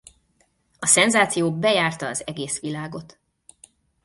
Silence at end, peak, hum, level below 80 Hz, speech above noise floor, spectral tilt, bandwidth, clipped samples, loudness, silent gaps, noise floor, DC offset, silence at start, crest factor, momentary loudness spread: 1 s; -2 dBFS; none; -62 dBFS; 44 dB; -2.5 dB/octave; 11.5 kHz; under 0.1%; -20 LUFS; none; -65 dBFS; under 0.1%; 0.8 s; 22 dB; 16 LU